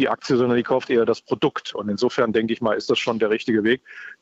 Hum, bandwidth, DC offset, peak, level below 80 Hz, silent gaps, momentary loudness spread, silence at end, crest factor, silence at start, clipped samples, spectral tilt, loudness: none; 8 kHz; under 0.1%; -8 dBFS; -62 dBFS; none; 5 LU; 0.1 s; 14 dB; 0 s; under 0.1%; -5.5 dB/octave; -21 LUFS